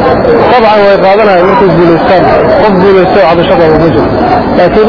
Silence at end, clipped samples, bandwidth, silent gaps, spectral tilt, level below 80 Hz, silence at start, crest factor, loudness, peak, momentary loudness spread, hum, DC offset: 0 s; 7%; 5.4 kHz; none; -8.5 dB/octave; -26 dBFS; 0 s; 4 dB; -5 LUFS; 0 dBFS; 3 LU; none; under 0.1%